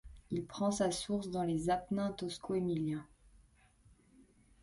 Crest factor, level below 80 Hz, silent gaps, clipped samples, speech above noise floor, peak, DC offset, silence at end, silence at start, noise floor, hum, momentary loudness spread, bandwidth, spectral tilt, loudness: 18 dB; -62 dBFS; none; under 0.1%; 30 dB; -20 dBFS; under 0.1%; 0.4 s; 0.05 s; -66 dBFS; none; 8 LU; 11.5 kHz; -5.5 dB/octave; -37 LUFS